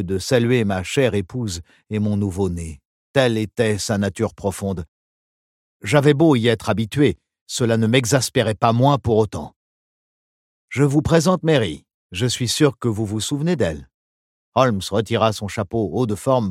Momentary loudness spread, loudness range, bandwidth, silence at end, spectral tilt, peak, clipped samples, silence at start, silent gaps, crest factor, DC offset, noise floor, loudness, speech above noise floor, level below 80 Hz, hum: 12 LU; 4 LU; 16 kHz; 0 s; -5.5 dB/octave; 0 dBFS; under 0.1%; 0 s; 2.85-3.14 s, 4.88-5.80 s, 7.41-7.46 s, 9.56-10.68 s, 11.94-12.09 s, 13.94-14.52 s; 20 dB; under 0.1%; under -90 dBFS; -20 LUFS; over 71 dB; -46 dBFS; none